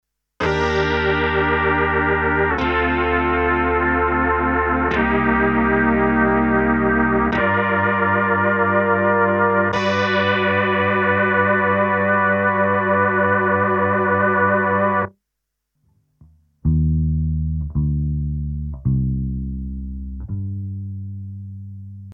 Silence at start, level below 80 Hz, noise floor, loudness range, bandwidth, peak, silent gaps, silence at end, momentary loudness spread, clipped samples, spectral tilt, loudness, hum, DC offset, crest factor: 0.4 s; -32 dBFS; -78 dBFS; 7 LU; 7 kHz; -2 dBFS; none; 0 s; 12 LU; under 0.1%; -7.5 dB/octave; -18 LUFS; none; under 0.1%; 16 dB